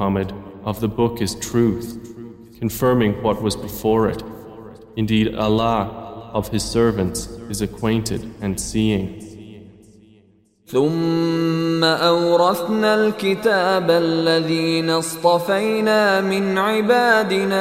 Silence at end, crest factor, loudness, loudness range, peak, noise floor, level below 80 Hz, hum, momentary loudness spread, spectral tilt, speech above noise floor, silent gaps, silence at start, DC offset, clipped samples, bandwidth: 0 s; 16 dB; -19 LUFS; 6 LU; -2 dBFS; -55 dBFS; -44 dBFS; none; 14 LU; -5 dB/octave; 37 dB; none; 0 s; under 0.1%; under 0.1%; 16 kHz